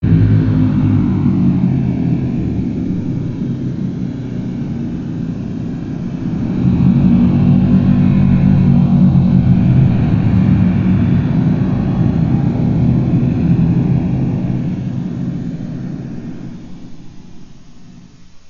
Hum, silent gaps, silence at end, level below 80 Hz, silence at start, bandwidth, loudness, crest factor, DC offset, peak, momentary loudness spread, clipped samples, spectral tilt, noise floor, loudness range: none; none; 0 s; -30 dBFS; 0 s; 6.4 kHz; -14 LUFS; 12 dB; under 0.1%; -2 dBFS; 12 LU; under 0.1%; -10 dB/octave; -37 dBFS; 10 LU